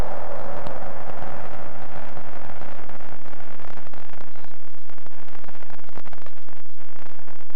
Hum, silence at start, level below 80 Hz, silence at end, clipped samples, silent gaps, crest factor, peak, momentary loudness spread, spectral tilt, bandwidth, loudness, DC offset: none; 0 s; -52 dBFS; 0 s; under 0.1%; none; 20 dB; -6 dBFS; 14 LU; -7.5 dB/octave; over 20 kHz; -40 LUFS; 40%